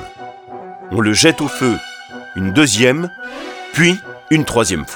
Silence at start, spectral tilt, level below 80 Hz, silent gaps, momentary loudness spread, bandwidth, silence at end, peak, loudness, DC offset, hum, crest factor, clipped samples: 0 s; -4 dB/octave; -44 dBFS; none; 21 LU; 19 kHz; 0 s; 0 dBFS; -15 LUFS; under 0.1%; none; 16 dB; under 0.1%